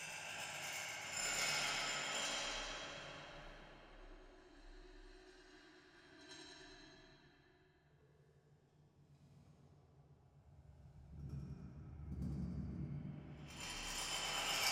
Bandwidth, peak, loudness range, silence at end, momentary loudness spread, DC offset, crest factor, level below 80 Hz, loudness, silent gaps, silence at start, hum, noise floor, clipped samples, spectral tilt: over 20 kHz; -22 dBFS; 23 LU; 0 s; 24 LU; under 0.1%; 24 dB; -62 dBFS; -43 LUFS; none; 0 s; none; -71 dBFS; under 0.1%; -2 dB/octave